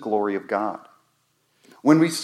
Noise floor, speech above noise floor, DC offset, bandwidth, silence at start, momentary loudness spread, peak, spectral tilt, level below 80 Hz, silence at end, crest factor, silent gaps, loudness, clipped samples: -68 dBFS; 47 dB; under 0.1%; 13 kHz; 0 s; 12 LU; -2 dBFS; -5.5 dB/octave; -80 dBFS; 0 s; 20 dB; none; -22 LUFS; under 0.1%